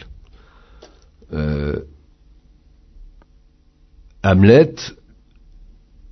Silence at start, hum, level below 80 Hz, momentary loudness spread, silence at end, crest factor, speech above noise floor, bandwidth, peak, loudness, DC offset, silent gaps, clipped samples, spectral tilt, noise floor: 1.3 s; none; -38 dBFS; 20 LU; 1.2 s; 20 dB; 38 dB; 6.4 kHz; 0 dBFS; -16 LUFS; under 0.1%; none; under 0.1%; -7.5 dB/octave; -53 dBFS